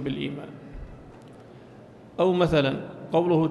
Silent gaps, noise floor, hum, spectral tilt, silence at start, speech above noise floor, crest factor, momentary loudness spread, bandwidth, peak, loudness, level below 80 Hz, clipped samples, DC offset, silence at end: none; -47 dBFS; none; -7.5 dB/octave; 0 s; 24 dB; 18 dB; 25 LU; 11.5 kHz; -10 dBFS; -25 LUFS; -48 dBFS; under 0.1%; under 0.1%; 0 s